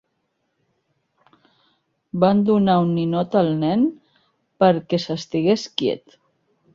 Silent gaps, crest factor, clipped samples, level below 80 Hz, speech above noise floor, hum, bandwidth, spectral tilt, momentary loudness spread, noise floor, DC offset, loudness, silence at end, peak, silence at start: none; 18 dB; under 0.1%; -62 dBFS; 54 dB; none; 7.6 kHz; -7 dB/octave; 7 LU; -72 dBFS; under 0.1%; -20 LUFS; 0.75 s; -4 dBFS; 2.15 s